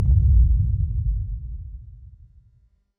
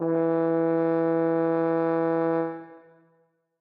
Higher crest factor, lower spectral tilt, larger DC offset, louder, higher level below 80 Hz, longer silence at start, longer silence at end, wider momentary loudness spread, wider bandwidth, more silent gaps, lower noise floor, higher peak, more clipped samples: about the same, 14 dB vs 12 dB; first, -13 dB/octave vs -11.5 dB/octave; neither; first, -22 LUFS vs -25 LUFS; first, -22 dBFS vs under -90 dBFS; about the same, 0 s vs 0 s; about the same, 0.9 s vs 0.85 s; first, 21 LU vs 4 LU; second, 0.6 kHz vs 4.2 kHz; neither; second, -60 dBFS vs -68 dBFS; first, -8 dBFS vs -14 dBFS; neither